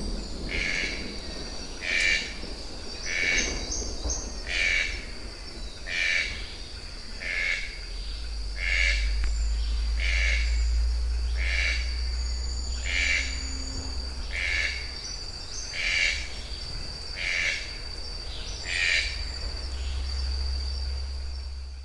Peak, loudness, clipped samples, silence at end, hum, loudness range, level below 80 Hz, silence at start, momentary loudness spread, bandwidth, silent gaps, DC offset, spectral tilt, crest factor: -10 dBFS; -28 LUFS; under 0.1%; 0 s; none; 2 LU; -32 dBFS; 0 s; 13 LU; 11.5 kHz; none; under 0.1%; -2.5 dB/octave; 18 dB